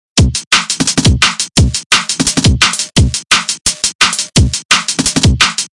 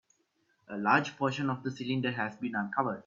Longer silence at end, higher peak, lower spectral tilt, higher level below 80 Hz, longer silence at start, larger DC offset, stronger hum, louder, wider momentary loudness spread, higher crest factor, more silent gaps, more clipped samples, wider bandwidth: about the same, 0.05 s vs 0.05 s; first, 0 dBFS vs -10 dBFS; second, -2.5 dB/octave vs -6 dB/octave; first, -22 dBFS vs -74 dBFS; second, 0.15 s vs 0.7 s; neither; neither; first, -11 LUFS vs -31 LUFS; second, 3 LU vs 8 LU; second, 12 dB vs 22 dB; first, 0.47-0.51 s, 1.86-1.90 s, 3.95-3.99 s, 4.65-4.69 s vs none; neither; first, 12 kHz vs 7.4 kHz